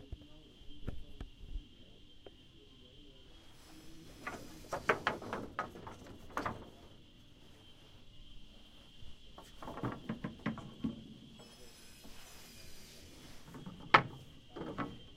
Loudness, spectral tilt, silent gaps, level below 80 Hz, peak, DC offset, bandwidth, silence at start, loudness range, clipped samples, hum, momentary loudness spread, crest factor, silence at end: -39 LUFS; -5 dB/octave; none; -56 dBFS; -6 dBFS; under 0.1%; 16 kHz; 0 s; 17 LU; under 0.1%; none; 22 LU; 38 dB; 0 s